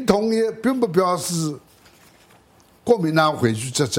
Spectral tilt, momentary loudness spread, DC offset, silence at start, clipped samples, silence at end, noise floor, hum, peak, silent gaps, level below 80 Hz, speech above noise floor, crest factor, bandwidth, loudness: -5 dB/octave; 8 LU; under 0.1%; 0 s; under 0.1%; 0 s; -54 dBFS; none; -2 dBFS; none; -56 dBFS; 34 dB; 18 dB; 16.5 kHz; -20 LUFS